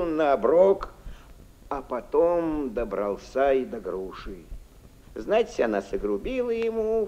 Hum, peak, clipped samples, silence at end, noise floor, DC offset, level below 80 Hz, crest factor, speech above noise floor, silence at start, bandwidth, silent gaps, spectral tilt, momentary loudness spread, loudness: none; -8 dBFS; under 0.1%; 0 s; -50 dBFS; under 0.1%; -46 dBFS; 18 dB; 25 dB; 0 s; 15 kHz; none; -6.5 dB/octave; 17 LU; -25 LUFS